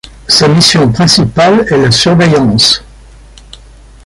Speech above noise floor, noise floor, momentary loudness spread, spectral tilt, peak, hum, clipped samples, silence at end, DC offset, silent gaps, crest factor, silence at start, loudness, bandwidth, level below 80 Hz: 28 dB; -35 dBFS; 3 LU; -4.5 dB/octave; 0 dBFS; none; 0.2%; 1.25 s; under 0.1%; none; 10 dB; 0.3 s; -7 LUFS; 16 kHz; -34 dBFS